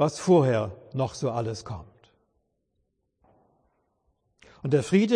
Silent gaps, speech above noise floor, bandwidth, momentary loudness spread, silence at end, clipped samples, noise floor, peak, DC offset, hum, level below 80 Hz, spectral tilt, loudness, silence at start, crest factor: none; 51 dB; 10.5 kHz; 16 LU; 0 s; under 0.1%; -75 dBFS; -8 dBFS; under 0.1%; none; -60 dBFS; -6.5 dB/octave; -26 LUFS; 0 s; 18 dB